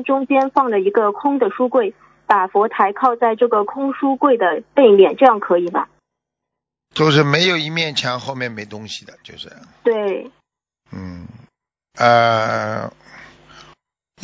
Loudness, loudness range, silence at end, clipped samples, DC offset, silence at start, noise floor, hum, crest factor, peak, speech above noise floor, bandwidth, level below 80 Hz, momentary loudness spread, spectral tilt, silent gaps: -16 LUFS; 9 LU; 1 s; under 0.1%; under 0.1%; 0 s; -82 dBFS; none; 18 dB; 0 dBFS; 65 dB; 7.8 kHz; -58 dBFS; 20 LU; -5.5 dB/octave; none